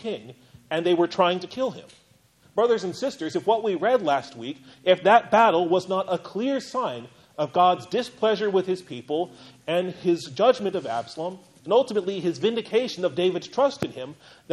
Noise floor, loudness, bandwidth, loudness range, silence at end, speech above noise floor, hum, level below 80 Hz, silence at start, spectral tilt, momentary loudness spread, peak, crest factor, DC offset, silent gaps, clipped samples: -59 dBFS; -24 LUFS; 12 kHz; 4 LU; 0 s; 35 dB; none; -70 dBFS; 0 s; -5.5 dB/octave; 14 LU; -6 dBFS; 20 dB; under 0.1%; none; under 0.1%